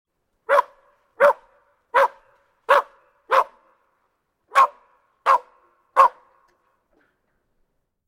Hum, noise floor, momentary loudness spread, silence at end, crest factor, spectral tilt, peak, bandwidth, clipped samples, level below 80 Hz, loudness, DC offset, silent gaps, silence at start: none; -72 dBFS; 14 LU; 2 s; 22 dB; -1.5 dB/octave; -2 dBFS; 17 kHz; under 0.1%; -72 dBFS; -20 LUFS; under 0.1%; none; 0.5 s